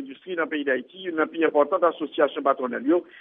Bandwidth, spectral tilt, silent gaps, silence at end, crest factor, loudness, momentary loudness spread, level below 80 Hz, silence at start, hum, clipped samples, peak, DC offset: 3.8 kHz; -2 dB/octave; none; 0 s; 18 dB; -24 LUFS; 7 LU; -82 dBFS; 0 s; none; under 0.1%; -6 dBFS; under 0.1%